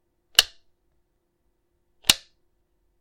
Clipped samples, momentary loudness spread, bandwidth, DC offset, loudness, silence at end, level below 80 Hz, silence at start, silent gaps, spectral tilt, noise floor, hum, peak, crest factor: under 0.1%; 6 LU; 16.5 kHz; under 0.1%; -21 LUFS; 0.85 s; -54 dBFS; 0.4 s; none; 1 dB/octave; -72 dBFS; none; 0 dBFS; 30 dB